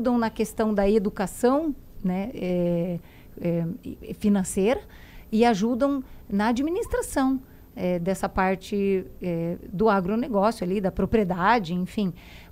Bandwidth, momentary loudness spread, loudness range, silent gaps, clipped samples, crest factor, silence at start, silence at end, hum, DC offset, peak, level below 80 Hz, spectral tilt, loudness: 16 kHz; 9 LU; 3 LU; none; under 0.1%; 18 dB; 0 s; 0.05 s; none; under 0.1%; -8 dBFS; -44 dBFS; -6.5 dB/octave; -25 LUFS